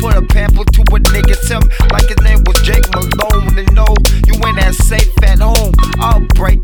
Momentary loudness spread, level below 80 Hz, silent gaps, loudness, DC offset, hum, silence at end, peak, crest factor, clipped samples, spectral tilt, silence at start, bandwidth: 2 LU; -8 dBFS; none; -11 LUFS; under 0.1%; none; 0 s; 0 dBFS; 8 dB; 0.1%; -5 dB/octave; 0 s; 19.5 kHz